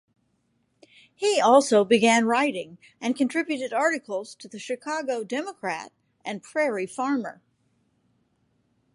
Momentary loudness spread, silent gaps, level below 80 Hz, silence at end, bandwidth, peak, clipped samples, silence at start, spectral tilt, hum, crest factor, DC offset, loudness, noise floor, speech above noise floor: 18 LU; none; -78 dBFS; 1.6 s; 11.5 kHz; -4 dBFS; under 0.1%; 1.2 s; -3.5 dB/octave; none; 22 dB; under 0.1%; -24 LUFS; -71 dBFS; 47 dB